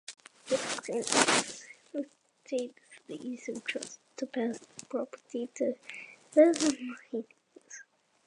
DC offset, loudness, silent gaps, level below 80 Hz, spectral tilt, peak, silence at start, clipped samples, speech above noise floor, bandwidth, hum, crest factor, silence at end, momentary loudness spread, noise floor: under 0.1%; -31 LUFS; none; -80 dBFS; -2 dB/octave; -4 dBFS; 0.1 s; under 0.1%; 25 dB; 11.5 kHz; none; 30 dB; 0.45 s; 22 LU; -57 dBFS